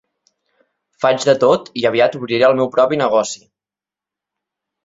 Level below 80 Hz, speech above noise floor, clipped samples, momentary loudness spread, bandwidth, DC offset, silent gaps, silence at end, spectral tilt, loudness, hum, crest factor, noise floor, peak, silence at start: -60 dBFS; 74 dB; under 0.1%; 5 LU; 7.8 kHz; under 0.1%; none; 1.5 s; -4.5 dB/octave; -15 LUFS; none; 16 dB; -89 dBFS; 0 dBFS; 1 s